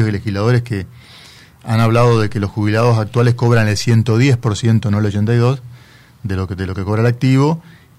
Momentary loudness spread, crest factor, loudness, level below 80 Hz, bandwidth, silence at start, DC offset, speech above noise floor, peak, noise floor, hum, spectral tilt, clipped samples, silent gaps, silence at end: 11 LU; 12 dB; -15 LUFS; -46 dBFS; 12 kHz; 0 s; under 0.1%; 29 dB; -2 dBFS; -43 dBFS; none; -7 dB/octave; under 0.1%; none; 0.4 s